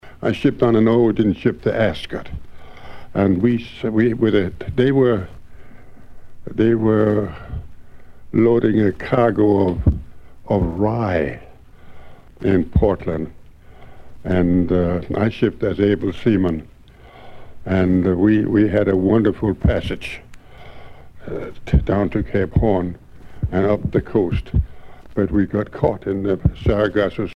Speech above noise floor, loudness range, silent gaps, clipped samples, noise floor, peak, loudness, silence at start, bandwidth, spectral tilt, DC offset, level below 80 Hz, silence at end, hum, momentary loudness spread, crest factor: 26 dB; 4 LU; none; under 0.1%; -43 dBFS; -2 dBFS; -19 LUFS; 0.05 s; 9.6 kHz; -9 dB/octave; under 0.1%; -32 dBFS; 0 s; none; 14 LU; 18 dB